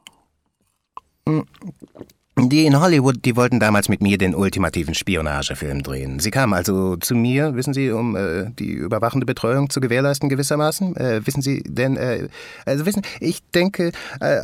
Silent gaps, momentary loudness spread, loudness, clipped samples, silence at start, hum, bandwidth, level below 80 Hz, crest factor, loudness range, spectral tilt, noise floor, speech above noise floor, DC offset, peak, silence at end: none; 10 LU; -20 LUFS; under 0.1%; 1.25 s; none; 16.5 kHz; -42 dBFS; 16 dB; 4 LU; -5.5 dB/octave; -69 dBFS; 50 dB; under 0.1%; -4 dBFS; 0 s